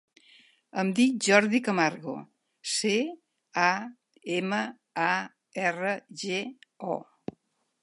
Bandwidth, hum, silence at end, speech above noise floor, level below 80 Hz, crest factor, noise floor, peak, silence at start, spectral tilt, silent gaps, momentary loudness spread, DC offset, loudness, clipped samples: 11.5 kHz; none; 0.8 s; 40 dB; -78 dBFS; 24 dB; -67 dBFS; -6 dBFS; 0.75 s; -4 dB/octave; none; 18 LU; under 0.1%; -28 LUFS; under 0.1%